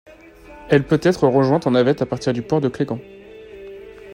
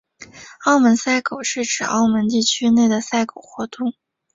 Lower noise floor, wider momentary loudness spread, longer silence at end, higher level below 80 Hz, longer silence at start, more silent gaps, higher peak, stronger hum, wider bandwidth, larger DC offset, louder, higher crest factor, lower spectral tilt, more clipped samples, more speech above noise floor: about the same, -43 dBFS vs -42 dBFS; first, 22 LU vs 13 LU; second, 0 s vs 0.45 s; first, -50 dBFS vs -60 dBFS; first, 0.5 s vs 0.2 s; neither; about the same, -2 dBFS vs -4 dBFS; neither; first, 16 kHz vs 7.8 kHz; neither; about the same, -18 LUFS vs -18 LUFS; about the same, 18 dB vs 14 dB; first, -7 dB/octave vs -3 dB/octave; neither; about the same, 25 dB vs 24 dB